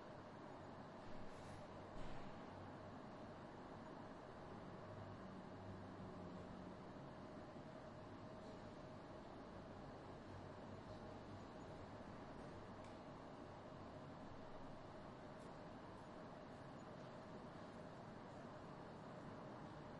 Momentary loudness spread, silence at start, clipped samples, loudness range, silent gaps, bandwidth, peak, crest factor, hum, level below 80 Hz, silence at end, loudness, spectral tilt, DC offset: 2 LU; 0 s; under 0.1%; 1 LU; none; 10.5 kHz; -40 dBFS; 16 dB; none; -68 dBFS; 0 s; -57 LUFS; -6.5 dB/octave; under 0.1%